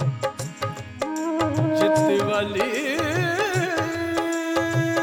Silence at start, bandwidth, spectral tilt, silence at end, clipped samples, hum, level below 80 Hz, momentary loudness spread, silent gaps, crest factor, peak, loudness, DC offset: 0 s; 18 kHz; -5.5 dB/octave; 0 s; under 0.1%; none; -56 dBFS; 10 LU; none; 18 dB; -6 dBFS; -23 LUFS; under 0.1%